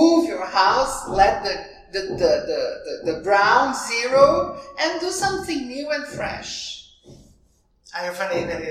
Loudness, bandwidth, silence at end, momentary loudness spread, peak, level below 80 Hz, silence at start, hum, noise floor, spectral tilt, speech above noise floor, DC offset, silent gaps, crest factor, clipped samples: -21 LUFS; 15.5 kHz; 0 s; 13 LU; -2 dBFS; -46 dBFS; 0 s; none; -60 dBFS; -3.5 dB/octave; 39 dB; under 0.1%; none; 20 dB; under 0.1%